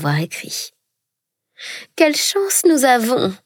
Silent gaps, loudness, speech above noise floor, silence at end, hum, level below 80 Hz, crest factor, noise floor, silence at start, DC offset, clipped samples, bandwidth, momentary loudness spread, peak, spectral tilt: none; -16 LUFS; 63 dB; 0.1 s; none; -74 dBFS; 18 dB; -80 dBFS; 0 s; under 0.1%; under 0.1%; 18 kHz; 18 LU; -2 dBFS; -3.5 dB/octave